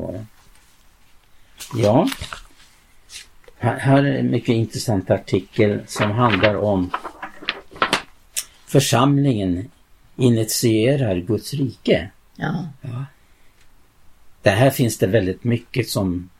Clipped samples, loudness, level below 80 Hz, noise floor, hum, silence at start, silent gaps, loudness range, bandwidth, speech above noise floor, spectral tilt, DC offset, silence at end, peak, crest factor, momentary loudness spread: under 0.1%; -20 LUFS; -50 dBFS; -51 dBFS; none; 0 s; none; 6 LU; 16.5 kHz; 32 dB; -5.5 dB/octave; under 0.1%; 0.1 s; 0 dBFS; 20 dB; 15 LU